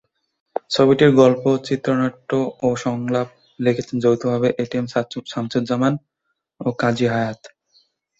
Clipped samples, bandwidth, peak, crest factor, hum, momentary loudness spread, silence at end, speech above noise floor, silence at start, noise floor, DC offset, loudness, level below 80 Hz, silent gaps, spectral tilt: under 0.1%; 8 kHz; 0 dBFS; 18 dB; none; 13 LU; 0.7 s; 57 dB; 0.7 s; -75 dBFS; under 0.1%; -20 LUFS; -58 dBFS; none; -6.5 dB/octave